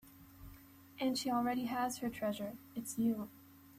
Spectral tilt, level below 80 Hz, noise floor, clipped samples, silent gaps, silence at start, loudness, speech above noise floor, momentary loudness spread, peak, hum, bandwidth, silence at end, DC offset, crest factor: -4 dB/octave; -68 dBFS; -58 dBFS; under 0.1%; none; 0.05 s; -38 LUFS; 21 dB; 22 LU; -24 dBFS; none; 15.5 kHz; 0 s; under 0.1%; 16 dB